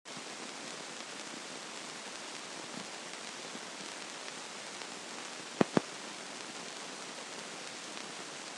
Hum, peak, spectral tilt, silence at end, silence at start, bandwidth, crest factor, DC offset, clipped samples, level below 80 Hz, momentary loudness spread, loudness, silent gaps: none; -8 dBFS; -3 dB/octave; 0 s; 0.05 s; 12.5 kHz; 32 dB; under 0.1%; under 0.1%; -84 dBFS; 7 LU; -41 LUFS; none